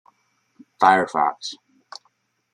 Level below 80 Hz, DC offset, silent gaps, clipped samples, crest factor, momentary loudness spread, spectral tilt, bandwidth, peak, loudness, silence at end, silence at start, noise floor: -74 dBFS; under 0.1%; none; under 0.1%; 22 dB; 26 LU; -4 dB/octave; 10.5 kHz; -2 dBFS; -19 LUFS; 1 s; 0.8 s; -67 dBFS